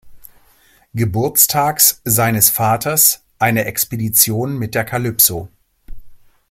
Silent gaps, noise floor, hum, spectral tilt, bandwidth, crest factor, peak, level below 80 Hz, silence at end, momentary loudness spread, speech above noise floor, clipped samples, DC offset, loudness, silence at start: none; -52 dBFS; none; -3 dB/octave; over 20 kHz; 18 dB; 0 dBFS; -44 dBFS; 0.35 s; 9 LU; 37 dB; under 0.1%; under 0.1%; -14 LUFS; 0.05 s